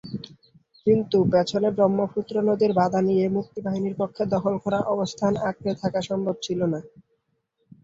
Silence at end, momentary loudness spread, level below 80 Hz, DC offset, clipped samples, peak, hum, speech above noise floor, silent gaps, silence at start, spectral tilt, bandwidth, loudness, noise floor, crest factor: 0.95 s; 7 LU; -58 dBFS; under 0.1%; under 0.1%; -8 dBFS; none; 50 dB; none; 0.05 s; -7 dB/octave; 7.8 kHz; -24 LUFS; -73 dBFS; 16 dB